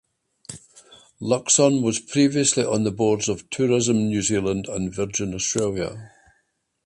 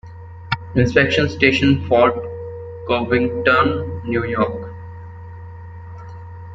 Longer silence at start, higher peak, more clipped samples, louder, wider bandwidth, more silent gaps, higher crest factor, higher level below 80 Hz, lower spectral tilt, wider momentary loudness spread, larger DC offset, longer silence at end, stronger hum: first, 0.5 s vs 0.05 s; second, -6 dBFS vs -2 dBFS; neither; second, -21 LUFS vs -17 LUFS; first, 11.5 kHz vs 7.8 kHz; neither; about the same, 18 dB vs 18 dB; second, -52 dBFS vs -44 dBFS; second, -4 dB/octave vs -6.5 dB/octave; second, 19 LU vs 22 LU; neither; first, 0.8 s vs 0 s; neither